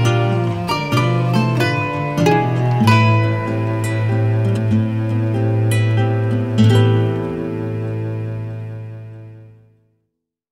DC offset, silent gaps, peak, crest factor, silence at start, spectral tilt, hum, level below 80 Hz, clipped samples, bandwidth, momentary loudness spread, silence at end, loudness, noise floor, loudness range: under 0.1%; none; -2 dBFS; 16 dB; 0 s; -7 dB/octave; none; -48 dBFS; under 0.1%; 12.5 kHz; 12 LU; 1.05 s; -17 LUFS; -75 dBFS; 6 LU